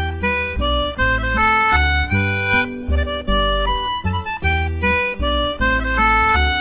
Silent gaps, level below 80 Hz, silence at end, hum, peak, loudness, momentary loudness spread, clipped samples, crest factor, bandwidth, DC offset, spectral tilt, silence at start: none; -24 dBFS; 0 s; none; -4 dBFS; -18 LUFS; 7 LU; under 0.1%; 14 dB; 4 kHz; under 0.1%; -8.5 dB/octave; 0 s